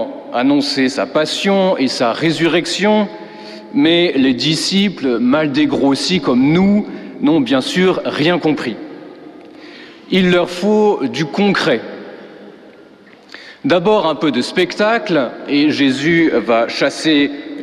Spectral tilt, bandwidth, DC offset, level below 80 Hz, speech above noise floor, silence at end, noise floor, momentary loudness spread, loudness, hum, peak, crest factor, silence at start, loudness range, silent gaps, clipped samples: -5 dB/octave; 12.5 kHz; under 0.1%; -52 dBFS; 28 dB; 0 s; -42 dBFS; 11 LU; -15 LUFS; none; -2 dBFS; 12 dB; 0 s; 4 LU; none; under 0.1%